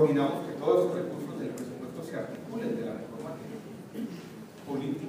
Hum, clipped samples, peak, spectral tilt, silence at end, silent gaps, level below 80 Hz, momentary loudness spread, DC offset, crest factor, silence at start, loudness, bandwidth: none; under 0.1%; -12 dBFS; -7 dB/octave; 0 s; none; -72 dBFS; 16 LU; under 0.1%; 20 dB; 0 s; -33 LUFS; 15.5 kHz